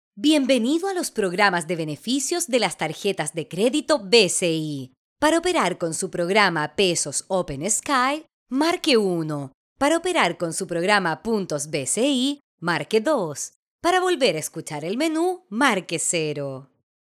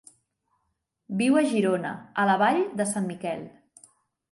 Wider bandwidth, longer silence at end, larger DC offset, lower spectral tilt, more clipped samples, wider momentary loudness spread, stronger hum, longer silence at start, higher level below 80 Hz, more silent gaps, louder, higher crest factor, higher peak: first, 15.5 kHz vs 11.5 kHz; second, 0.4 s vs 0.8 s; neither; second, -3 dB/octave vs -5 dB/octave; neither; about the same, 10 LU vs 12 LU; neither; second, 0.15 s vs 1.1 s; first, -60 dBFS vs -74 dBFS; first, 4.97-5.16 s, 8.33-8.46 s, 9.54-9.76 s, 12.44-12.58 s, 13.56-13.79 s vs none; first, -22 LUFS vs -25 LUFS; about the same, 20 dB vs 18 dB; first, -4 dBFS vs -8 dBFS